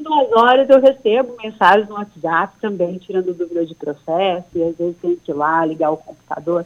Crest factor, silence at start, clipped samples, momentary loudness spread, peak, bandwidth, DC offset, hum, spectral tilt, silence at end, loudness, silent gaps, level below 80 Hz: 16 dB; 0 s; under 0.1%; 13 LU; -2 dBFS; 7 kHz; under 0.1%; none; -6.5 dB/octave; 0 s; -17 LUFS; none; -60 dBFS